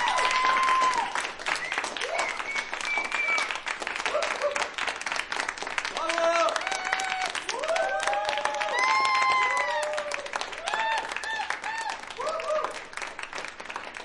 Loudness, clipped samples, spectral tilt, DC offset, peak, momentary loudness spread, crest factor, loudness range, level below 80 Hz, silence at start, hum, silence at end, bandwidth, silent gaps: -27 LUFS; under 0.1%; 0 dB/octave; under 0.1%; -8 dBFS; 10 LU; 22 dB; 5 LU; -60 dBFS; 0 s; none; 0 s; 11.5 kHz; none